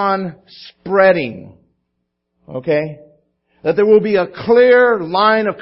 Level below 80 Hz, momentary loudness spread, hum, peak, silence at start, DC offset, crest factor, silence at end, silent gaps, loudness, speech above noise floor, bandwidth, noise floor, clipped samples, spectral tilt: -58 dBFS; 18 LU; none; 0 dBFS; 0 s; under 0.1%; 16 dB; 0 s; none; -14 LUFS; 58 dB; 5.8 kHz; -73 dBFS; under 0.1%; -10.5 dB/octave